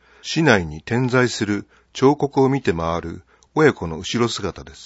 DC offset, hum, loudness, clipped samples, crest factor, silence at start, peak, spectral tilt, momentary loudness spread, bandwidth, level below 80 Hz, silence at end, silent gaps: under 0.1%; none; -20 LUFS; under 0.1%; 20 dB; 0.25 s; 0 dBFS; -5.5 dB/octave; 11 LU; 8 kHz; -46 dBFS; 0 s; none